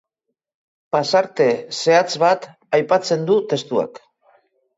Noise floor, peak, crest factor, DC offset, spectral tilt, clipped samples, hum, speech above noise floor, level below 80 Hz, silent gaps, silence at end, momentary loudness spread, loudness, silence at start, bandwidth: -79 dBFS; -2 dBFS; 18 dB; under 0.1%; -4.5 dB/octave; under 0.1%; none; 61 dB; -70 dBFS; none; 0.8 s; 7 LU; -18 LUFS; 0.95 s; 8 kHz